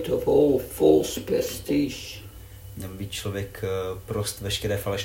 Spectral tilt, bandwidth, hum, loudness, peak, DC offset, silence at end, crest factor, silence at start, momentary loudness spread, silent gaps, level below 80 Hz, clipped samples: -5 dB/octave; 16.5 kHz; none; -25 LUFS; -6 dBFS; under 0.1%; 0 s; 18 dB; 0 s; 18 LU; none; -46 dBFS; under 0.1%